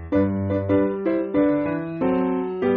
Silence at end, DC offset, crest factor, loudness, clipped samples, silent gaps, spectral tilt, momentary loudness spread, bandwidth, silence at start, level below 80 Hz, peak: 0 s; under 0.1%; 12 dB; -22 LUFS; under 0.1%; none; -8 dB/octave; 4 LU; 4.3 kHz; 0 s; -50 dBFS; -8 dBFS